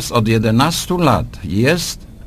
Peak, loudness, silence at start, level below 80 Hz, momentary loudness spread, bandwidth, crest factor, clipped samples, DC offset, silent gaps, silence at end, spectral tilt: 0 dBFS; -16 LUFS; 0 s; -34 dBFS; 6 LU; 15.5 kHz; 16 dB; under 0.1%; under 0.1%; none; 0 s; -5 dB/octave